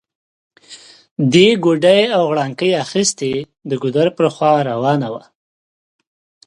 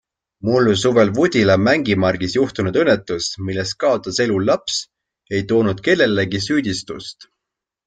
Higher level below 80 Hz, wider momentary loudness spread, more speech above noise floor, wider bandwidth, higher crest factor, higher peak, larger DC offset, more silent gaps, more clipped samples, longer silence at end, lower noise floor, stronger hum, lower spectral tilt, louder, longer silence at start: second, -60 dBFS vs -52 dBFS; about the same, 12 LU vs 10 LU; second, 27 dB vs 66 dB; first, 11.5 kHz vs 9.4 kHz; about the same, 16 dB vs 16 dB; about the same, 0 dBFS vs -2 dBFS; neither; first, 1.11-1.16 s vs none; neither; first, 1.25 s vs 0.75 s; second, -41 dBFS vs -83 dBFS; neither; about the same, -5 dB/octave vs -5 dB/octave; first, -15 LUFS vs -18 LUFS; first, 0.7 s vs 0.45 s